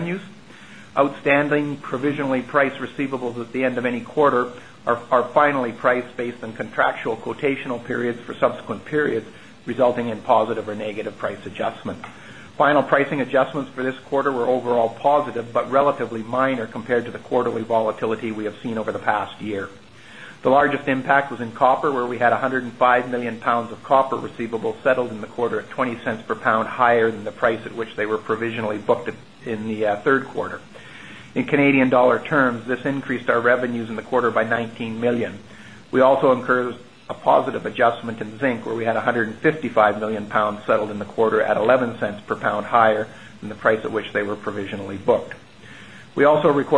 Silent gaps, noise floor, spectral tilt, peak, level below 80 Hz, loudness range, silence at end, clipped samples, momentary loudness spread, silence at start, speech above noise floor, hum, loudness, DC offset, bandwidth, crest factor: none; -43 dBFS; -6.5 dB/octave; 0 dBFS; -60 dBFS; 4 LU; 0 s; under 0.1%; 12 LU; 0 s; 22 dB; none; -21 LUFS; 0.4%; 10.5 kHz; 20 dB